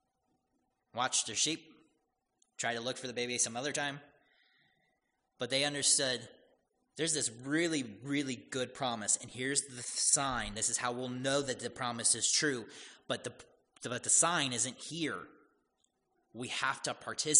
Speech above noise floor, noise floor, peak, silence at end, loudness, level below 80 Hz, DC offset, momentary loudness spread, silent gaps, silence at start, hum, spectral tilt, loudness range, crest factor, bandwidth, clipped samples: 46 dB; -81 dBFS; -10 dBFS; 0 s; -33 LUFS; -66 dBFS; under 0.1%; 12 LU; none; 0.95 s; none; -1.5 dB/octave; 5 LU; 26 dB; 10.5 kHz; under 0.1%